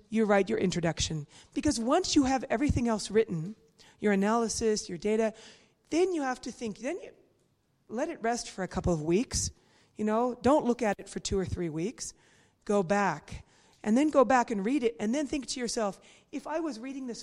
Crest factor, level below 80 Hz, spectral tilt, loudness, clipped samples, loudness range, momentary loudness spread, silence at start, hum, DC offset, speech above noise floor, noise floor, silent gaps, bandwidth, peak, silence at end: 20 dB; -52 dBFS; -5 dB/octave; -30 LUFS; under 0.1%; 5 LU; 12 LU; 0.1 s; none; under 0.1%; 42 dB; -71 dBFS; none; 13 kHz; -10 dBFS; 0 s